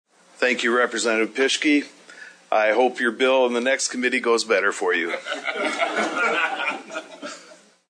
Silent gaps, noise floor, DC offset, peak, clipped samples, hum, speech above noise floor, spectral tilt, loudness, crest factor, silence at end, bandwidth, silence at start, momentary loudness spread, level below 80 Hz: none; -49 dBFS; under 0.1%; -6 dBFS; under 0.1%; none; 28 dB; -1.5 dB/octave; -21 LUFS; 16 dB; 0.35 s; 10.5 kHz; 0.4 s; 13 LU; -82 dBFS